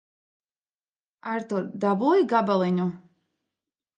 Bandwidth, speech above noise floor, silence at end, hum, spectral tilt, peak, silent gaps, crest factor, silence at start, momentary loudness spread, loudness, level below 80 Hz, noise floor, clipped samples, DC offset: 8.6 kHz; over 66 dB; 1 s; none; -8 dB/octave; -8 dBFS; none; 18 dB; 1.25 s; 11 LU; -24 LUFS; -76 dBFS; under -90 dBFS; under 0.1%; under 0.1%